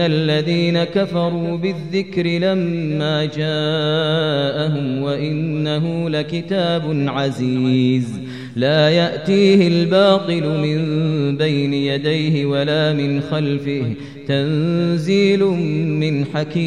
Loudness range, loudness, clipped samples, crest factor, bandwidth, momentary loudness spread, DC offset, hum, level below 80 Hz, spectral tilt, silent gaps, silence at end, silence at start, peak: 4 LU; -18 LUFS; under 0.1%; 16 dB; 10 kHz; 7 LU; 0.3%; none; -58 dBFS; -7 dB/octave; none; 0 s; 0 s; -2 dBFS